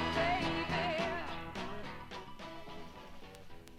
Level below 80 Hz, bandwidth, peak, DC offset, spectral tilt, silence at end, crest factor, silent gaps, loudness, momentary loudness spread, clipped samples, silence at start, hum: -54 dBFS; 15 kHz; -20 dBFS; under 0.1%; -5 dB/octave; 0 s; 18 dB; none; -37 LUFS; 20 LU; under 0.1%; 0 s; none